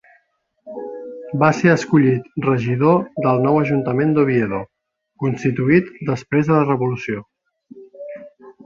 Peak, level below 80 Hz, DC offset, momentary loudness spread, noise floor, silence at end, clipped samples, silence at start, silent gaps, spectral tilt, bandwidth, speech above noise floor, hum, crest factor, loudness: -2 dBFS; -56 dBFS; under 0.1%; 18 LU; -65 dBFS; 0.15 s; under 0.1%; 0.65 s; none; -8 dB/octave; 7.6 kHz; 48 dB; none; 18 dB; -18 LUFS